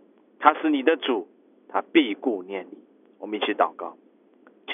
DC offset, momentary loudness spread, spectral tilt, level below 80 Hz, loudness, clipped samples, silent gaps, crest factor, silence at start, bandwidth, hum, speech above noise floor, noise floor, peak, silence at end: under 0.1%; 19 LU; -6 dB/octave; under -90 dBFS; -24 LUFS; under 0.1%; none; 24 dB; 0.4 s; 3.8 kHz; none; 33 dB; -56 dBFS; -2 dBFS; 0 s